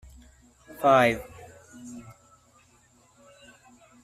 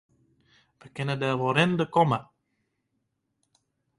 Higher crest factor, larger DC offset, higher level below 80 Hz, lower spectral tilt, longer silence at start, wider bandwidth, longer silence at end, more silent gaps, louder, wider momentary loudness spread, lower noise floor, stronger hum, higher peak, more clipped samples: about the same, 24 dB vs 22 dB; neither; first, -58 dBFS vs -66 dBFS; second, -5 dB/octave vs -6.5 dB/octave; about the same, 0.8 s vs 0.85 s; first, 15 kHz vs 11 kHz; first, 2.05 s vs 1.75 s; neither; first, -22 LUFS vs -25 LUFS; first, 29 LU vs 10 LU; second, -61 dBFS vs -78 dBFS; neither; about the same, -6 dBFS vs -8 dBFS; neither